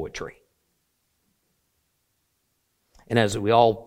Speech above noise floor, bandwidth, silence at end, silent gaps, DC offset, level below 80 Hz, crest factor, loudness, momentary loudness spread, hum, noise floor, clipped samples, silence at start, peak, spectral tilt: 51 dB; 16 kHz; 0.05 s; none; under 0.1%; -56 dBFS; 24 dB; -21 LUFS; 18 LU; none; -73 dBFS; under 0.1%; 0 s; -4 dBFS; -5.5 dB/octave